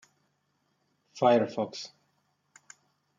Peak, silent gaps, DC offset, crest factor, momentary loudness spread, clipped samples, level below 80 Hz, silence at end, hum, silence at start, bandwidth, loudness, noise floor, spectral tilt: -10 dBFS; none; under 0.1%; 24 dB; 18 LU; under 0.1%; -82 dBFS; 1.3 s; none; 1.15 s; 7.6 kHz; -27 LUFS; -75 dBFS; -5.5 dB/octave